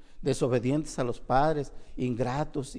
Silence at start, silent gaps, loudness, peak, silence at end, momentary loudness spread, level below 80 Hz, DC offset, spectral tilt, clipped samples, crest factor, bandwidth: 0 s; none; -29 LUFS; -12 dBFS; 0 s; 8 LU; -44 dBFS; under 0.1%; -6.5 dB/octave; under 0.1%; 18 dB; 10.5 kHz